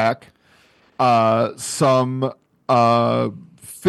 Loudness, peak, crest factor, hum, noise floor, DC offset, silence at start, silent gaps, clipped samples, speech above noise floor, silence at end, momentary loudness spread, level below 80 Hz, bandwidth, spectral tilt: -18 LUFS; -4 dBFS; 16 dB; none; -55 dBFS; under 0.1%; 0 s; none; under 0.1%; 37 dB; 0 s; 16 LU; -66 dBFS; 12.5 kHz; -5.5 dB/octave